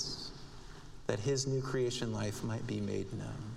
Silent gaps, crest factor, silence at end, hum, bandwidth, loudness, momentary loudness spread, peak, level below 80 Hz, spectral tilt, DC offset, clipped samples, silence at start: none; 20 dB; 0 s; none; 15 kHz; -37 LUFS; 17 LU; -18 dBFS; -54 dBFS; -5 dB/octave; under 0.1%; under 0.1%; 0 s